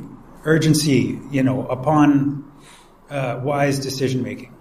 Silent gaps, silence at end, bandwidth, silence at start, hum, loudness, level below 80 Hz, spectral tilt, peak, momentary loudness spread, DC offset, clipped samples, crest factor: none; 0.05 s; 15.5 kHz; 0 s; none; -19 LUFS; -48 dBFS; -6 dB/octave; -4 dBFS; 13 LU; under 0.1%; under 0.1%; 16 dB